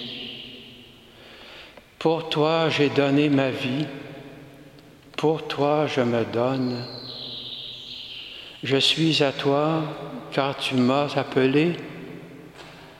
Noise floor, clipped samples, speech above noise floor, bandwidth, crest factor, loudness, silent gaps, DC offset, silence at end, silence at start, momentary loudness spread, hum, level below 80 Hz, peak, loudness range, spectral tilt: -48 dBFS; under 0.1%; 26 dB; 14.5 kHz; 20 dB; -23 LUFS; none; under 0.1%; 0 s; 0 s; 22 LU; none; -62 dBFS; -6 dBFS; 3 LU; -5.5 dB/octave